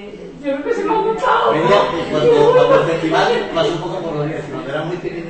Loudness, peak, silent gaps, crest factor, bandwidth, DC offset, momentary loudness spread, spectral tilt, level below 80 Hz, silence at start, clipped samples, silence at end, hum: -16 LUFS; -2 dBFS; none; 14 dB; 8.6 kHz; under 0.1%; 12 LU; -6 dB/octave; -46 dBFS; 0 s; under 0.1%; 0 s; none